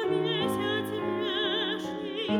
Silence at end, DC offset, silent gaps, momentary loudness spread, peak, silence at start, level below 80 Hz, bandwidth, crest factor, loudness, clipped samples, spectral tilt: 0 s; under 0.1%; none; 6 LU; -14 dBFS; 0 s; -66 dBFS; 17.5 kHz; 14 dB; -29 LUFS; under 0.1%; -5 dB/octave